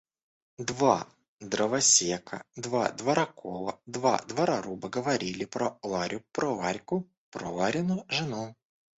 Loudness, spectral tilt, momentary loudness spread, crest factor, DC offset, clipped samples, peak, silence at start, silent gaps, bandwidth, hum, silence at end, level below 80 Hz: -29 LUFS; -3 dB/octave; 13 LU; 22 dB; under 0.1%; under 0.1%; -8 dBFS; 0.6 s; 1.28-1.38 s, 7.17-7.32 s; 8.4 kHz; none; 0.45 s; -66 dBFS